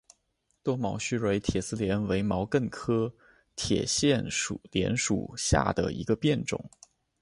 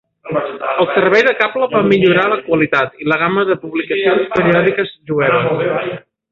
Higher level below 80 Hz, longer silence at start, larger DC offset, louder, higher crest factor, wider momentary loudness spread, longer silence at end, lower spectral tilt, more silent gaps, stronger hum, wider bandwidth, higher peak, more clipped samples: first, -46 dBFS vs -52 dBFS; first, 0.65 s vs 0.25 s; neither; second, -29 LUFS vs -14 LUFS; first, 22 dB vs 14 dB; about the same, 7 LU vs 9 LU; first, 0.55 s vs 0.35 s; second, -4.5 dB/octave vs -7 dB/octave; neither; neither; first, 11.5 kHz vs 7 kHz; second, -8 dBFS vs 0 dBFS; neither